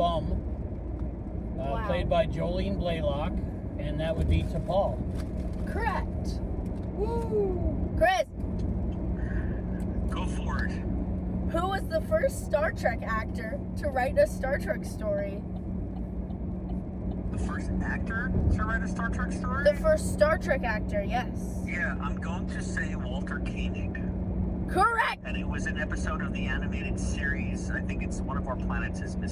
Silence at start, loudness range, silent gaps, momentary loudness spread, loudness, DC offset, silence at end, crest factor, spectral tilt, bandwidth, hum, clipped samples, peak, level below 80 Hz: 0 s; 4 LU; none; 9 LU; -30 LUFS; under 0.1%; 0 s; 18 dB; -6.5 dB/octave; 14.5 kHz; none; under 0.1%; -10 dBFS; -34 dBFS